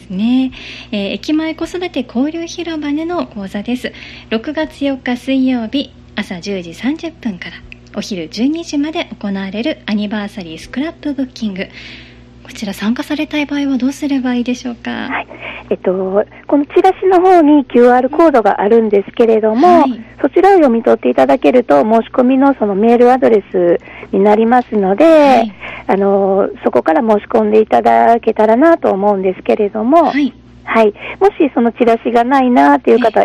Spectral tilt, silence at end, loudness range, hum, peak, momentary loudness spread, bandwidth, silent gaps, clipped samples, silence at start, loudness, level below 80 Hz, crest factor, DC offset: -6 dB/octave; 0 s; 10 LU; 60 Hz at -40 dBFS; 0 dBFS; 13 LU; 13 kHz; none; under 0.1%; 0.1 s; -13 LUFS; -46 dBFS; 12 dB; under 0.1%